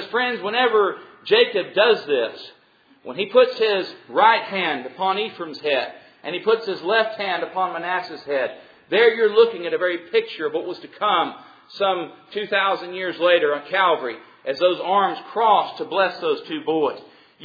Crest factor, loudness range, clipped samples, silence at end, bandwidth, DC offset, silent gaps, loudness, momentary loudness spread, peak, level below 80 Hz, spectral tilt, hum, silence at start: 20 dB; 3 LU; under 0.1%; 0 s; 5 kHz; under 0.1%; none; -21 LUFS; 11 LU; -2 dBFS; -74 dBFS; -5.5 dB/octave; none; 0 s